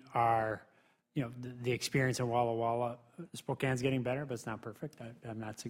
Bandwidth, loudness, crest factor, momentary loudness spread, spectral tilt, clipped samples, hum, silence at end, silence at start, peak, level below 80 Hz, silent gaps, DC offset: 16 kHz; -35 LUFS; 18 dB; 14 LU; -5.5 dB/octave; under 0.1%; none; 0 s; 0.05 s; -18 dBFS; -68 dBFS; none; under 0.1%